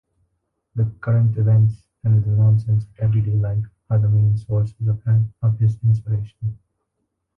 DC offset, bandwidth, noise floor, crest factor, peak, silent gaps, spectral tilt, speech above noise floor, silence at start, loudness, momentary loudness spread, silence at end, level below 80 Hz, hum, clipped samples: under 0.1%; 1.8 kHz; -75 dBFS; 10 dB; -8 dBFS; none; -11.5 dB/octave; 57 dB; 0.75 s; -20 LUFS; 9 LU; 0.85 s; -44 dBFS; none; under 0.1%